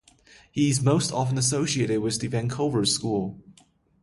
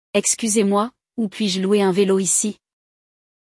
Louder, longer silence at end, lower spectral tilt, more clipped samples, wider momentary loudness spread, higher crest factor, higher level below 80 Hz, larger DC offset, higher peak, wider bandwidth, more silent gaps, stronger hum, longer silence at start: second, -25 LUFS vs -19 LUFS; second, 0.5 s vs 0.9 s; about the same, -4.5 dB/octave vs -4 dB/octave; neither; second, 6 LU vs 10 LU; about the same, 18 dB vs 16 dB; first, -56 dBFS vs -68 dBFS; neither; about the same, -8 dBFS vs -6 dBFS; about the same, 11.5 kHz vs 12 kHz; neither; neither; first, 0.55 s vs 0.15 s